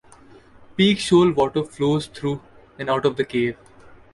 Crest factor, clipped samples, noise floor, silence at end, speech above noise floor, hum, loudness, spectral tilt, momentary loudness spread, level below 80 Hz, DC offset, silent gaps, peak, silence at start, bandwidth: 18 dB; under 0.1%; -48 dBFS; 0.6 s; 28 dB; none; -21 LUFS; -6 dB/octave; 15 LU; -54 dBFS; under 0.1%; none; -4 dBFS; 0.8 s; 11.5 kHz